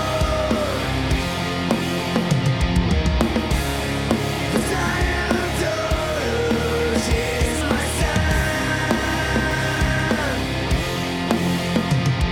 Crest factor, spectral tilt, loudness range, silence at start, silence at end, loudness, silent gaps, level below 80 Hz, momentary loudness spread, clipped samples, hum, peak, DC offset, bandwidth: 16 dB; -5 dB/octave; 1 LU; 0 s; 0 s; -21 LUFS; none; -28 dBFS; 2 LU; under 0.1%; none; -4 dBFS; under 0.1%; 18.5 kHz